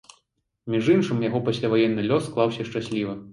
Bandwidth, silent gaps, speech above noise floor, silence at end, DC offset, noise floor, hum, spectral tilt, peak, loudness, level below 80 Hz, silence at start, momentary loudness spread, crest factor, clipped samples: 11.5 kHz; none; 49 dB; 0 s; under 0.1%; -72 dBFS; none; -7 dB/octave; -6 dBFS; -24 LUFS; -60 dBFS; 0.65 s; 8 LU; 18 dB; under 0.1%